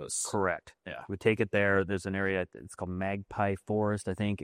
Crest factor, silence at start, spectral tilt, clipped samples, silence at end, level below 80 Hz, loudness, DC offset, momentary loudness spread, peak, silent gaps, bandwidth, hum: 20 dB; 0 s; -5 dB/octave; under 0.1%; 0 s; -64 dBFS; -31 LUFS; under 0.1%; 13 LU; -12 dBFS; none; 15.5 kHz; none